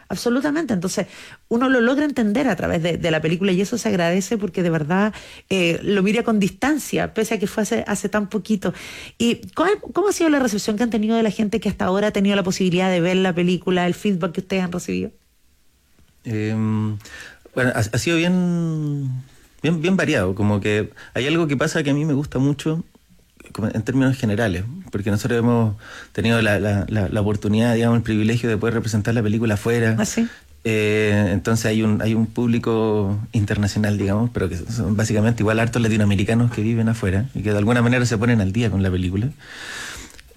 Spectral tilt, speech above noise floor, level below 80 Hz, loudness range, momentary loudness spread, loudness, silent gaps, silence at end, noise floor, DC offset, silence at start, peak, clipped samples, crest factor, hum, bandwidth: -6 dB/octave; 37 dB; -48 dBFS; 3 LU; 8 LU; -20 LUFS; none; 0.15 s; -57 dBFS; under 0.1%; 0.1 s; -8 dBFS; under 0.1%; 12 dB; none; 15.5 kHz